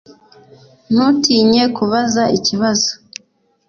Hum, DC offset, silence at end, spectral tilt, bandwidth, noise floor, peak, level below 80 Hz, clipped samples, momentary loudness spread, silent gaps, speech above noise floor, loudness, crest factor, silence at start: none; under 0.1%; 0.75 s; -3.5 dB/octave; 7.2 kHz; -58 dBFS; -2 dBFS; -54 dBFS; under 0.1%; 13 LU; none; 44 dB; -14 LUFS; 14 dB; 0.1 s